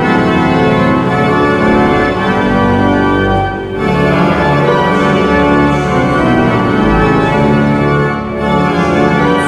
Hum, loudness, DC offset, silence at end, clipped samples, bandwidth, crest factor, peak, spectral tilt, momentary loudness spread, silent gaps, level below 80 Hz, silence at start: none; -11 LUFS; under 0.1%; 0 s; under 0.1%; 12 kHz; 10 dB; 0 dBFS; -7 dB/octave; 3 LU; none; -28 dBFS; 0 s